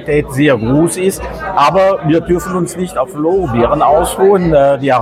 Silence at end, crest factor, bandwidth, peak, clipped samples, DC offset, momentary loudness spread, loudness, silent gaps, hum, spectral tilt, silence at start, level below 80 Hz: 0 s; 12 dB; 16 kHz; 0 dBFS; under 0.1%; under 0.1%; 8 LU; -12 LUFS; none; none; -6 dB/octave; 0 s; -32 dBFS